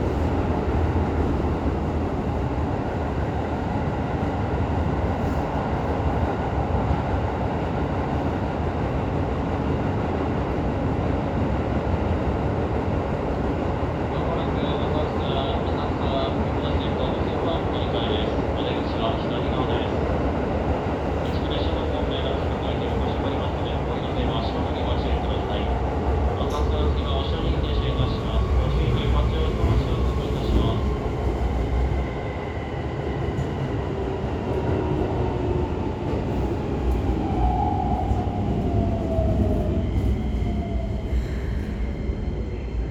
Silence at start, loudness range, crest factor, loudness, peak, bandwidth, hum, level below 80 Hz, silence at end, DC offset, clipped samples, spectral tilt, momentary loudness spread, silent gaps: 0 s; 2 LU; 16 dB; -25 LUFS; -8 dBFS; 8 kHz; none; -30 dBFS; 0 s; under 0.1%; under 0.1%; -8 dB/octave; 4 LU; none